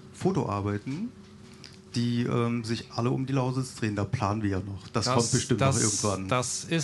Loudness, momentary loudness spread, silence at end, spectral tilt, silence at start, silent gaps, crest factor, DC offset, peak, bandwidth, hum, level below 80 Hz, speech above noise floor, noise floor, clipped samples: -28 LUFS; 11 LU; 0 s; -5 dB/octave; 0 s; none; 20 dB; under 0.1%; -8 dBFS; 12 kHz; none; -58 dBFS; 21 dB; -48 dBFS; under 0.1%